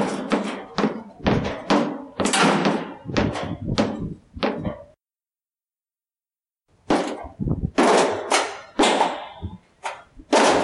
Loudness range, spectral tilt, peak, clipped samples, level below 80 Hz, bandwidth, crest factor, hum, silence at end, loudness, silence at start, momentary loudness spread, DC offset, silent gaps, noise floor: 8 LU; -4.5 dB/octave; -4 dBFS; under 0.1%; -44 dBFS; 12 kHz; 20 dB; none; 0 s; -22 LUFS; 0 s; 16 LU; under 0.1%; none; under -90 dBFS